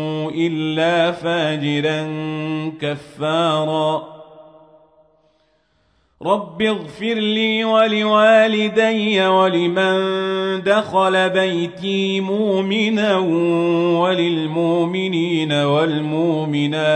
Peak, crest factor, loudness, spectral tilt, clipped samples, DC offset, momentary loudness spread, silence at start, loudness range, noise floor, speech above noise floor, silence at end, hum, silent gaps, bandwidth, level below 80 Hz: -2 dBFS; 16 dB; -18 LUFS; -6 dB/octave; under 0.1%; under 0.1%; 8 LU; 0 s; 8 LU; -62 dBFS; 44 dB; 0 s; none; none; 9.8 kHz; -64 dBFS